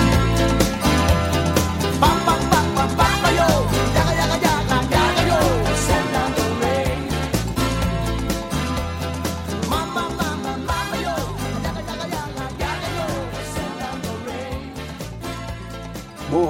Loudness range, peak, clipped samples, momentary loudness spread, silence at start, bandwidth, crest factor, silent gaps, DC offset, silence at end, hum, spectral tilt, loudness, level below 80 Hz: 9 LU; 0 dBFS; under 0.1%; 12 LU; 0 s; 16.5 kHz; 20 dB; none; under 0.1%; 0 s; none; -5 dB/octave; -21 LUFS; -30 dBFS